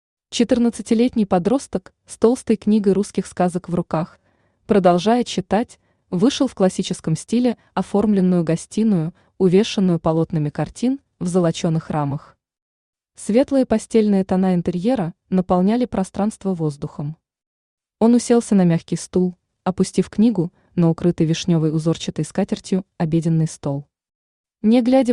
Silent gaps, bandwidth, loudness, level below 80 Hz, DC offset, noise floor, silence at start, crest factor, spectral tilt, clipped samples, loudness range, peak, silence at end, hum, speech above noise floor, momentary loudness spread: 12.62-12.93 s, 17.47-17.78 s, 24.15-24.44 s; 11 kHz; -19 LUFS; -52 dBFS; under 0.1%; -46 dBFS; 0.3 s; 16 dB; -7 dB/octave; under 0.1%; 3 LU; -4 dBFS; 0 s; none; 28 dB; 9 LU